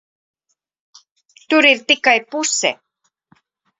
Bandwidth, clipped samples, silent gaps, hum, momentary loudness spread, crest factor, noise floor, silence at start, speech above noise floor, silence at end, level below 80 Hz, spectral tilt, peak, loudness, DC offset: 8.4 kHz; under 0.1%; none; none; 8 LU; 20 dB; -59 dBFS; 1.5 s; 43 dB; 1.05 s; -70 dBFS; -0.5 dB/octave; 0 dBFS; -15 LUFS; under 0.1%